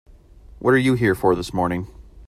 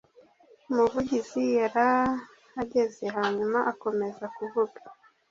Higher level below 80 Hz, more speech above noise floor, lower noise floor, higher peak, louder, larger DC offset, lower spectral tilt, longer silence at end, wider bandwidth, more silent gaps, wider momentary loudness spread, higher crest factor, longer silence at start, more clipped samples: first, -44 dBFS vs -62 dBFS; second, 26 dB vs 31 dB; second, -45 dBFS vs -58 dBFS; first, -4 dBFS vs -10 dBFS; first, -20 LUFS vs -28 LUFS; neither; about the same, -6.5 dB/octave vs -5.5 dB/octave; second, 0.05 s vs 0.4 s; first, 15.5 kHz vs 7.6 kHz; neither; about the same, 10 LU vs 10 LU; about the same, 16 dB vs 18 dB; about the same, 0.6 s vs 0.7 s; neither